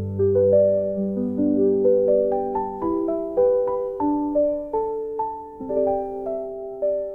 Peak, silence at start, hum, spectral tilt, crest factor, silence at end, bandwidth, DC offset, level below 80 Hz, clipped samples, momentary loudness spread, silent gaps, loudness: -8 dBFS; 0 s; none; -12.5 dB/octave; 14 dB; 0 s; 2.5 kHz; 0.1%; -52 dBFS; under 0.1%; 10 LU; none; -22 LUFS